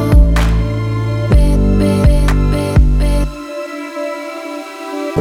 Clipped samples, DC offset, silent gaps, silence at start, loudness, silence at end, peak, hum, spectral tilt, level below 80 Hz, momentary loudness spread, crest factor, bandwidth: under 0.1%; under 0.1%; none; 0 s; -15 LUFS; 0 s; 0 dBFS; none; -7.5 dB/octave; -14 dBFS; 13 LU; 12 dB; 12.5 kHz